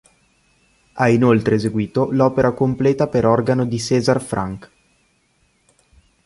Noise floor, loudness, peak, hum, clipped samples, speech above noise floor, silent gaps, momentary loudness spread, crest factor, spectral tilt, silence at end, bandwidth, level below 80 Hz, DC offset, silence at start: -62 dBFS; -18 LUFS; -2 dBFS; none; under 0.1%; 45 dB; none; 9 LU; 16 dB; -7 dB/octave; 1.6 s; 11.5 kHz; -48 dBFS; under 0.1%; 0.95 s